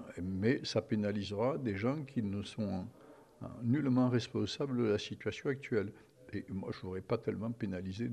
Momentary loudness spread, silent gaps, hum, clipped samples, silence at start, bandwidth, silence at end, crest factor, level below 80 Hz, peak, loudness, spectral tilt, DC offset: 11 LU; none; none; under 0.1%; 0 s; 11 kHz; 0 s; 18 dB; -68 dBFS; -18 dBFS; -36 LUFS; -7 dB/octave; under 0.1%